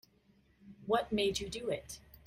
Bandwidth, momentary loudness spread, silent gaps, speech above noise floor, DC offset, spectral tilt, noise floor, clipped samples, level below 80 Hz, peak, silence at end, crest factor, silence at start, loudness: 16 kHz; 15 LU; none; 34 dB; under 0.1%; -4 dB/octave; -69 dBFS; under 0.1%; -60 dBFS; -16 dBFS; 0.3 s; 20 dB; 0.65 s; -35 LUFS